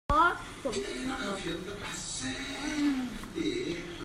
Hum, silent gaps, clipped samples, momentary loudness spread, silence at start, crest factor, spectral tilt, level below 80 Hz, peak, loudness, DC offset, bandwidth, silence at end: none; none; under 0.1%; 10 LU; 0.1 s; 20 dB; -3.5 dB/octave; -48 dBFS; -14 dBFS; -33 LUFS; under 0.1%; 14.5 kHz; 0 s